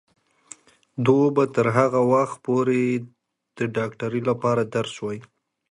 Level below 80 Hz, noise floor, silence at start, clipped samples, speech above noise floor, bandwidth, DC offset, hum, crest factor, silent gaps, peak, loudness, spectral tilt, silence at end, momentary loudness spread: -64 dBFS; -49 dBFS; 0.95 s; under 0.1%; 27 dB; 11 kHz; under 0.1%; none; 20 dB; none; -4 dBFS; -22 LUFS; -7 dB/octave; 0.5 s; 11 LU